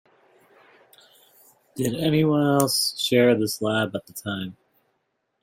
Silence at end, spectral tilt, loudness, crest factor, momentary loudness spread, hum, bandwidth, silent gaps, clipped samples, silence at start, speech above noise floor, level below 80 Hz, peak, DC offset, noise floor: 0.9 s; -4.5 dB/octave; -22 LUFS; 24 dB; 13 LU; none; 16.5 kHz; none; under 0.1%; 1.75 s; 52 dB; -64 dBFS; -2 dBFS; under 0.1%; -74 dBFS